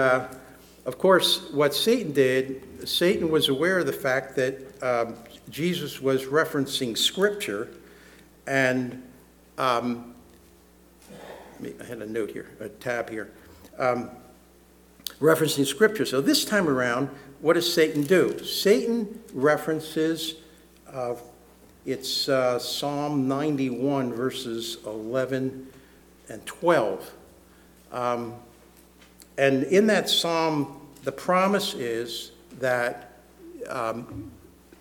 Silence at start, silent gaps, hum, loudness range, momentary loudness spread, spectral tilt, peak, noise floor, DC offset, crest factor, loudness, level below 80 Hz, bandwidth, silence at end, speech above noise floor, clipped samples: 0 s; none; none; 9 LU; 18 LU; -4 dB/octave; -6 dBFS; -55 dBFS; under 0.1%; 20 dB; -25 LUFS; -62 dBFS; 19 kHz; 0.45 s; 30 dB; under 0.1%